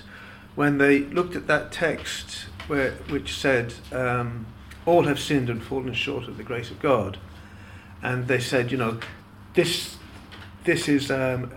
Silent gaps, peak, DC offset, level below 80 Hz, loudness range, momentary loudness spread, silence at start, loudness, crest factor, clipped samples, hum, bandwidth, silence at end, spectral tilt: none; -6 dBFS; under 0.1%; -48 dBFS; 3 LU; 22 LU; 0 s; -25 LUFS; 20 dB; under 0.1%; none; 17 kHz; 0 s; -5 dB/octave